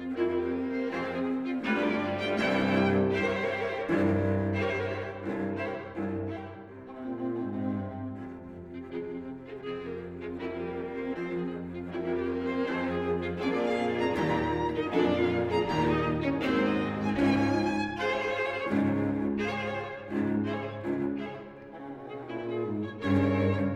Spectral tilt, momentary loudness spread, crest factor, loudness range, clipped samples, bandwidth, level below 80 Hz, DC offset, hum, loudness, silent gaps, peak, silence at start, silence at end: -7.5 dB/octave; 12 LU; 16 dB; 9 LU; under 0.1%; 10 kHz; -56 dBFS; under 0.1%; none; -30 LUFS; none; -14 dBFS; 0 s; 0 s